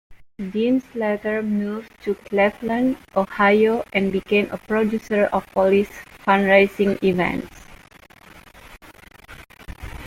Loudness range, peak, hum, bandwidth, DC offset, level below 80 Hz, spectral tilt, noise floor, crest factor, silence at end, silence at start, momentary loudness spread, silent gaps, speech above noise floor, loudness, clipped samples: 3 LU; -2 dBFS; none; 16 kHz; under 0.1%; -48 dBFS; -7 dB/octave; -48 dBFS; 20 dB; 0 s; 0.1 s; 14 LU; none; 28 dB; -20 LUFS; under 0.1%